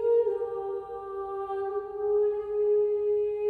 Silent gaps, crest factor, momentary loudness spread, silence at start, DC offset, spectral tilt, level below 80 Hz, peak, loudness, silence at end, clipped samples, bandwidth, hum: none; 12 dB; 10 LU; 0 s; under 0.1%; -8 dB/octave; -64 dBFS; -16 dBFS; -29 LUFS; 0 s; under 0.1%; 3.4 kHz; none